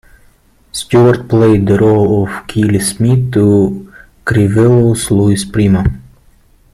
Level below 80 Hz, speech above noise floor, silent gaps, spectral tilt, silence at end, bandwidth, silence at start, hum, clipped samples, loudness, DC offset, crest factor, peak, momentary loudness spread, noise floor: -34 dBFS; 38 dB; none; -6.5 dB/octave; 0.7 s; 14.5 kHz; 0.75 s; none; under 0.1%; -11 LUFS; under 0.1%; 10 dB; 0 dBFS; 9 LU; -48 dBFS